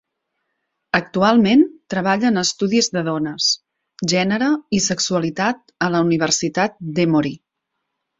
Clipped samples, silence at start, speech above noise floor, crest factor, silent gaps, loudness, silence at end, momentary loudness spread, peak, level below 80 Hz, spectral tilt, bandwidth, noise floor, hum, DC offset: under 0.1%; 0.95 s; 59 dB; 18 dB; none; -18 LUFS; 0.85 s; 7 LU; -2 dBFS; -58 dBFS; -4 dB/octave; 8 kHz; -77 dBFS; none; under 0.1%